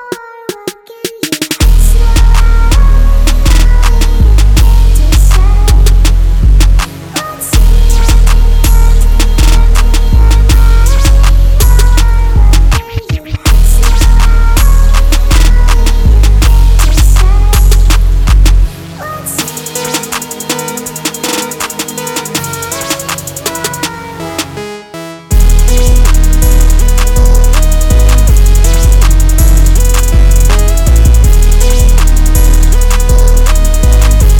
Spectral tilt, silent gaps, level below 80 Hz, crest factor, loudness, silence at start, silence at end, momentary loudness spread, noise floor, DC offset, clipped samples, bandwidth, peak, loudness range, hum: -4.5 dB/octave; none; -6 dBFS; 6 dB; -10 LUFS; 0 s; 0 s; 9 LU; -25 dBFS; under 0.1%; 3%; 17 kHz; 0 dBFS; 7 LU; none